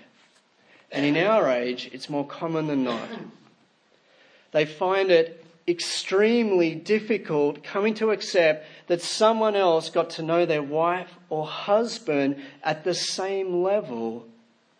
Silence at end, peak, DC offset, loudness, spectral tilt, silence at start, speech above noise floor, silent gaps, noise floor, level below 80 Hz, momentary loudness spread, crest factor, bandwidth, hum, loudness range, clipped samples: 0.55 s; -6 dBFS; under 0.1%; -24 LUFS; -4.5 dB/octave; 0.9 s; 38 dB; none; -62 dBFS; -82 dBFS; 11 LU; 18 dB; 10.5 kHz; none; 3 LU; under 0.1%